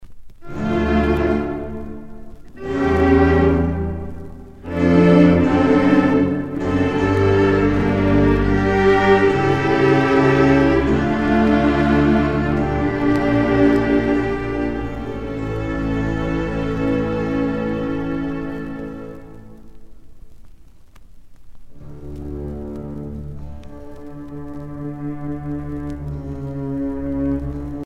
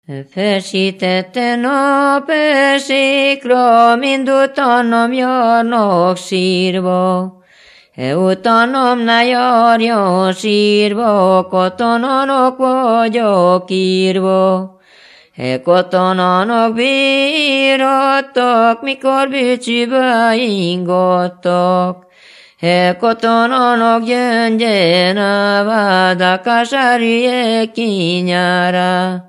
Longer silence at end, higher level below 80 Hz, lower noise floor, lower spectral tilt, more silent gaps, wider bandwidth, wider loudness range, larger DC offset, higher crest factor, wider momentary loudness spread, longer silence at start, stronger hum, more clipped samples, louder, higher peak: about the same, 0 s vs 0.05 s; first, -32 dBFS vs -68 dBFS; second, -41 dBFS vs -45 dBFS; first, -8 dB/octave vs -5.5 dB/octave; neither; second, 8.4 kHz vs 12 kHz; first, 18 LU vs 3 LU; neither; first, 18 dB vs 12 dB; first, 19 LU vs 5 LU; about the same, 0 s vs 0.1 s; neither; neither; second, -18 LUFS vs -12 LUFS; about the same, 0 dBFS vs 0 dBFS